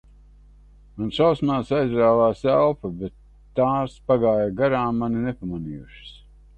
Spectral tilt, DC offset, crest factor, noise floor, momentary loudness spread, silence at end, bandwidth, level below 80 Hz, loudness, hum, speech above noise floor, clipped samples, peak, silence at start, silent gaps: -8 dB/octave; under 0.1%; 16 dB; -49 dBFS; 15 LU; 0.45 s; 8.8 kHz; -48 dBFS; -22 LUFS; 50 Hz at -50 dBFS; 28 dB; under 0.1%; -6 dBFS; 0.95 s; none